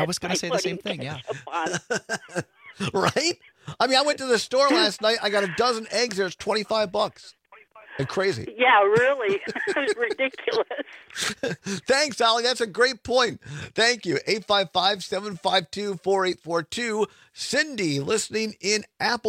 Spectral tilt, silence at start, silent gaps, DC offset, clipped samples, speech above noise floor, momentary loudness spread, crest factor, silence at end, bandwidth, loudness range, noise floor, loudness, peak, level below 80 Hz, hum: -3 dB/octave; 0 s; none; under 0.1%; under 0.1%; 27 dB; 11 LU; 18 dB; 0 s; 16 kHz; 4 LU; -51 dBFS; -24 LUFS; -8 dBFS; -64 dBFS; none